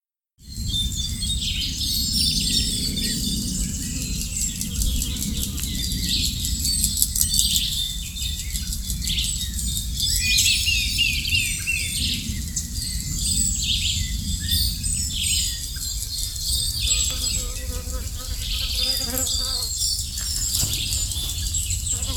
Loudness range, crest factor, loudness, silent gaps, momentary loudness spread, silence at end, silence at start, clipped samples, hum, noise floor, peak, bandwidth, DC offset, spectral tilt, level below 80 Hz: 3 LU; 24 dB; -22 LUFS; none; 8 LU; 0 s; 0.4 s; under 0.1%; none; -48 dBFS; 0 dBFS; 19 kHz; under 0.1%; -1.5 dB/octave; -30 dBFS